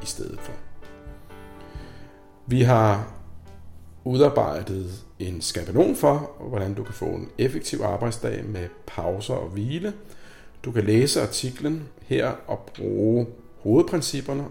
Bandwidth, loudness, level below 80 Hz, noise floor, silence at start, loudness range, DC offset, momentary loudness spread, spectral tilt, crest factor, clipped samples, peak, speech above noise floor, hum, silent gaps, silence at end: 16.5 kHz; -24 LUFS; -48 dBFS; -45 dBFS; 0 s; 5 LU; under 0.1%; 23 LU; -6 dB/octave; 20 dB; under 0.1%; -6 dBFS; 21 dB; none; none; 0 s